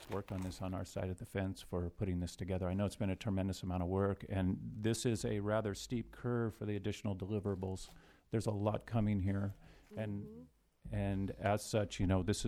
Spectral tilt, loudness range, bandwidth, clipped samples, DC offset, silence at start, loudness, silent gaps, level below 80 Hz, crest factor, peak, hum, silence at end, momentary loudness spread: -6.5 dB/octave; 2 LU; 14.5 kHz; under 0.1%; under 0.1%; 0 s; -39 LUFS; none; -56 dBFS; 18 dB; -20 dBFS; none; 0 s; 8 LU